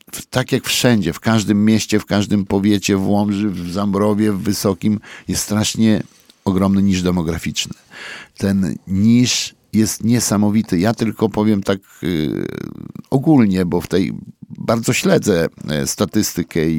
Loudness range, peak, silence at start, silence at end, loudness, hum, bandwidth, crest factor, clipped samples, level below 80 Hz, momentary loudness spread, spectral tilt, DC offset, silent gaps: 2 LU; 0 dBFS; 0.15 s; 0 s; -17 LUFS; none; 17.5 kHz; 16 dB; under 0.1%; -44 dBFS; 9 LU; -5 dB/octave; under 0.1%; none